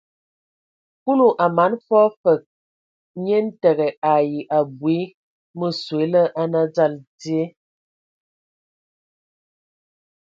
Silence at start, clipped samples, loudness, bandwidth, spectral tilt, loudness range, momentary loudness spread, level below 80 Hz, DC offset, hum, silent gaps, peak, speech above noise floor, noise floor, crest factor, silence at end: 1.05 s; under 0.1%; -20 LUFS; 7.6 kHz; -7.5 dB/octave; 7 LU; 12 LU; -72 dBFS; under 0.1%; none; 2.17-2.24 s, 2.46-3.14 s, 3.97-4.02 s, 5.14-5.54 s, 7.07-7.18 s; -2 dBFS; over 71 dB; under -90 dBFS; 18 dB; 2.75 s